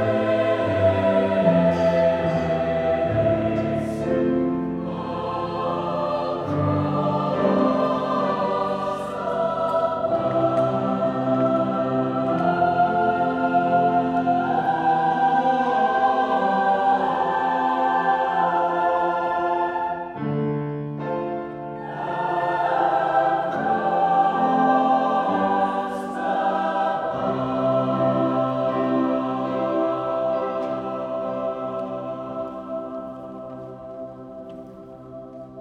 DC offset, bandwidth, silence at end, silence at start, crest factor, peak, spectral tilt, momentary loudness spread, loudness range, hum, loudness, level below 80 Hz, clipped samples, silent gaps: under 0.1%; 9.6 kHz; 0 s; 0 s; 16 dB; -6 dBFS; -8 dB/octave; 11 LU; 6 LU; none; -22 LUFS; -56 dBFS; under 0.1%; none